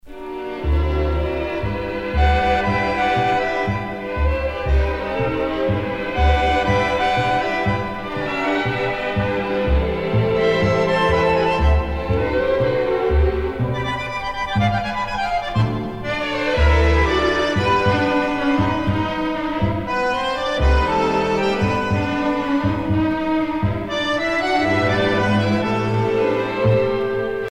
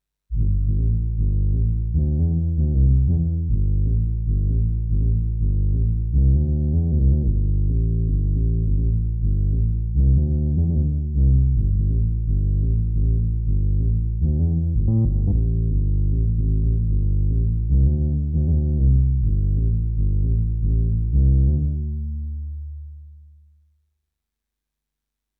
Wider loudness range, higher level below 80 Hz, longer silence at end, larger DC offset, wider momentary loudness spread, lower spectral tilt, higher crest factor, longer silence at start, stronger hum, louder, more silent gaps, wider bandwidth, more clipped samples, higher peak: about the same, 2 LU vs 2 LU; second, -26 dBFS vs -20 dBFS; second, 0.05 s vs 2.25 s; neither; about the same, 6 LU vs 4 LU; second, -6.5 dB/octave vs -15.5 dB/octave; about the same, 14 dB vs 10 dB; second, 0.05 s vs 0.3 s; neither; about the same, -19 LUFS vs -21 LUFS; neither; first, 9.4 kHz vs 0.9 kHz; neither; first, -4 dBFS vs -8 dBFS